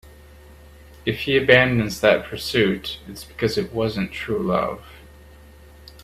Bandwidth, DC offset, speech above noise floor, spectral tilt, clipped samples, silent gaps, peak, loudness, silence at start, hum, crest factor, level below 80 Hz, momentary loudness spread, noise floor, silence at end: 15.5 kHz; under 0.1%; 25 dB; -5.5 dB/octave; under 0.1%; none; 0 dBFS; -21 LUFS; 0.05 s; none; 22 dB; -46 dBFS; 14 LU; -46 dBFS; 0 s